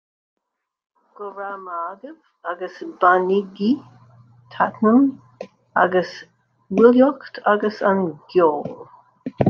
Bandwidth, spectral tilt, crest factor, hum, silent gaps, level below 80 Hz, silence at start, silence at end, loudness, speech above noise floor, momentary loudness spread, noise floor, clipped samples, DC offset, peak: 6.6 kHz; -8 dB/octave; 20 dB; none; none; -64 dBFS; 1.2 s; 0 s; -19 LUFS; 60 dB; 20 LU; -79 dBFS; under 0.1%; under 0.1%; -2 dBFS